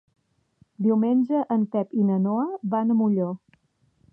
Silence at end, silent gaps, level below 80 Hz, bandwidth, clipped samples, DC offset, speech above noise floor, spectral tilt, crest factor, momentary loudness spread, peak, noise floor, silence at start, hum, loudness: 0.75 s; none; -76 dBFS; 3.2 kHz; under 0.1%; under 0.1%; 43 dB; -12 dB/octave; 12 dB; 5 LU; -12 dBFS; -66 dBFS; 0.8 s; none; -24 LUFS